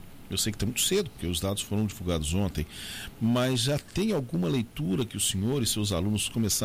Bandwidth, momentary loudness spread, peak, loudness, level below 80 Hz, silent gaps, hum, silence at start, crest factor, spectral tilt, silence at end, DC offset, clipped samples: 16 kHz; 6 LU; -12 dBFS; -28 LUFS; -46 dBFS; none; none; 0 s; 16 dB; -4.5 dB/octave; 0 s; under 0.1%; under 0.1%